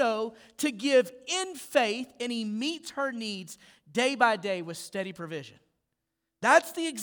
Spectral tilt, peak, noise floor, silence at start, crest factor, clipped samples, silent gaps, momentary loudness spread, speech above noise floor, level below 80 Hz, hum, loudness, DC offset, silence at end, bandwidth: -3 dB/octave; -8 dBFS; -83 dBFS; 0 s; 22 dB; under 0.1%; none; 14 LU; 54 dB; -78 dBFS; none; -28 LUFS; under 0.1%; 0 s; over 20 kHz